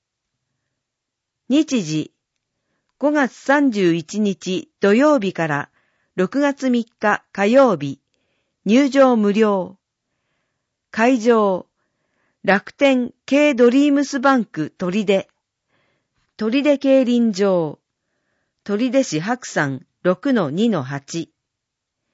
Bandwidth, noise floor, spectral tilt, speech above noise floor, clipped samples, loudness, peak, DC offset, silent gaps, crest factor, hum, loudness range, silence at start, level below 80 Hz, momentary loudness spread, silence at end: 8 kHz; -81 dBFS; -5.5 dB/octave; 64 dB; under 0.1%; -18 LUFS; -2 dBFS; under 0.1%; none; 18 dB; none; 4 LU; 1.5 s; -68 dBFS; 13 LU; 0.9 s